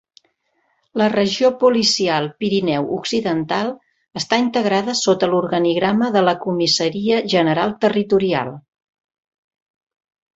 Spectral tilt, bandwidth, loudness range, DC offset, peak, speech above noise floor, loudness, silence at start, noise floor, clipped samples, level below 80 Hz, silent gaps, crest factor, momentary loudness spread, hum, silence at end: -4.5 dB/octave; 8.2 kHz; 3 LU; under 0.1%; -2 dBFS; 49 dB; -18 LUFS; 0.95 s; -66 dBFS; under 0.1%; -58 dBFS; none; 18 dB; 6 LU; none; 1.75 s